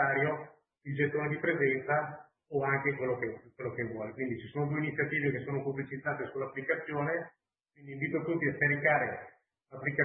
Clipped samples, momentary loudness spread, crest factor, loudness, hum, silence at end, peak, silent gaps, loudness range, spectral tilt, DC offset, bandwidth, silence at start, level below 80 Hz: under 0.1%; 12 LU; 20 dB; -33 LUFS; none; 0 s; -14 dBFS; none; 3 LU; -10.5 dB/octave; under 0.1%; 3.7 kHz; 0 s; -70 dBFS